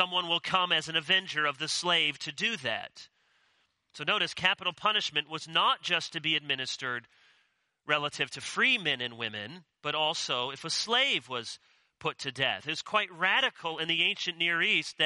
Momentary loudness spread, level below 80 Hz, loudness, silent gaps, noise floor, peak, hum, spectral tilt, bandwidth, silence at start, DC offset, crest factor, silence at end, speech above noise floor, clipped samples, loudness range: 10 LU; -76 dBFS; -29 LUFS; none; -73 dBFS; -8 dBFS; none; -2 dB/octave; 11.5 kHz; 0 s; under 0.1%; 22 dB; 0 s; 42 dB; under 0.1%; 2 LU